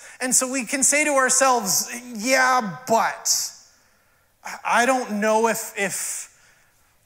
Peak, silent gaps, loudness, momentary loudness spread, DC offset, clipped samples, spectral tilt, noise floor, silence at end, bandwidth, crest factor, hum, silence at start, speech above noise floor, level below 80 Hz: -4 dBFS; none; -20 LUFS; 13 LU; under 0.1%; under 0.1%; -1.5 dB/octave; -61 dBFS; 0.8 s; 16 kHz; 18 dB; none; 0 s; 40 dB; -70 dBFS